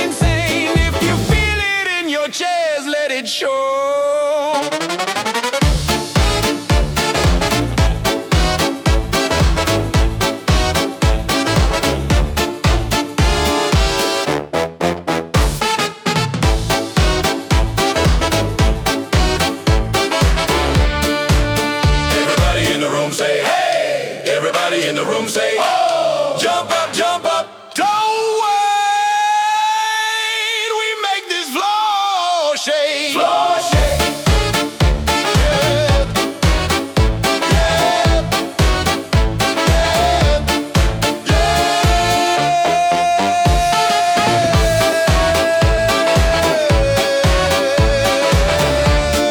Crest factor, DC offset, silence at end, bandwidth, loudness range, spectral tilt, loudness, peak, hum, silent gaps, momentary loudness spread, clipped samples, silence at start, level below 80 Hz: 12 dB; under 0.1%; 0 s; over 20 kHz; 3 LU; -4.5 dB/octave; -15 LUFS; -4 dBFS; none; none; 4 LU; under 0.1%; 0 s; -22 dBFS